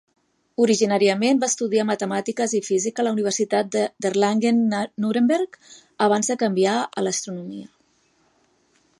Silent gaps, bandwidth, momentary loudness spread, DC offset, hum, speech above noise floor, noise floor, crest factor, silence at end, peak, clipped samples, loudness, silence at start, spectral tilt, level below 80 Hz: none; 11.5 kHz; 7 LU; under 0.1%; none; 42 dB; -63 dBFS; 16 dB; 1.35 s; -6 dBFS; under 0.1%; -21 LUFS; 0.6 s; -4 dB/octave; -74 dBFS